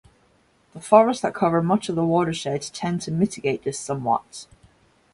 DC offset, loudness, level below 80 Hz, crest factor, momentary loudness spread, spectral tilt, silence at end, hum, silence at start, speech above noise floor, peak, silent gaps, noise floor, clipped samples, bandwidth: under 0.1%; -22 LUFS; -58 dBFS; 22 dB; 11 LU; -6 dB/octave; 0.7 s; none; 0.75 s; 39 dB; -2 dBFS; none; -61 dBFS; under 0.1%; 11.5 kHz